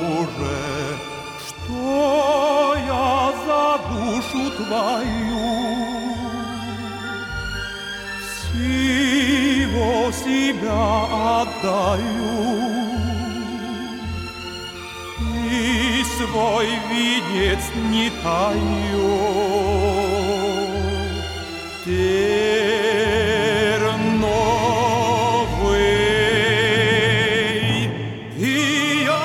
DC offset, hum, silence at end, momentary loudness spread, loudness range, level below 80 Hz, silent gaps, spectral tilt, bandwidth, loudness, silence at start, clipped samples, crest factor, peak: under 0.1%; none; 0 s; 11 LU; 6 LU; -36 dBFS; none; -4.5 dB/octave; 17 kHz; -20 LUFS; 0 s; under 0.1%; 14 dB; -6 dBFS